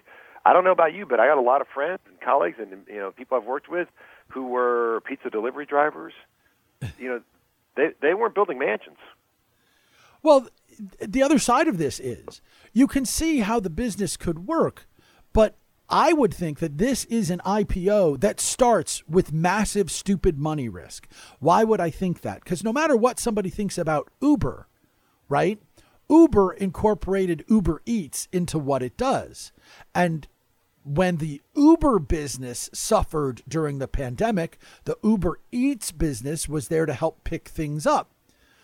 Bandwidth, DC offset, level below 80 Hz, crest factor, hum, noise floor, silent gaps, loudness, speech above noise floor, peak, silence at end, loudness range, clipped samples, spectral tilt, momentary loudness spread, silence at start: 16.5 kHz; under 0.1%; -40 dBFS; 22 dB; none; -67 dBFS; none; -23 LUFS; 44 dB; -2 dBFS; 0.6 s; 5 LU; under 0.1%; -5.5 dB/octave; 14 LU; 0.35 s